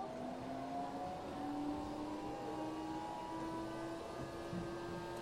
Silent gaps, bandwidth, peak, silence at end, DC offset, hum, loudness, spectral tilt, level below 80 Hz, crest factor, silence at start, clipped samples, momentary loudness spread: none; 16 kHz; -30 dBFS; 0 s; under 0.1%; none; -45 LUFS; -6 dB/octave; -64 dBFS; 14 dB; 0 s; under 0.1%; 3 LU